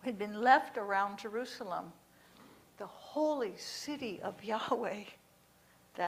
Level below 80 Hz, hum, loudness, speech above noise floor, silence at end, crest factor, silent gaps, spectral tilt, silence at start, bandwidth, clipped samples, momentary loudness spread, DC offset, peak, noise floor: -78 dBFS; 60 Hz at -75 dBFS; -35 LUFS; 30 dB; 0 s; 24 dB; none; -4 dB/octave; 0 s; 15.5 kHz; under 0.1%; 21 LU; under 0.1%; -12 dBFS; -66 dBFS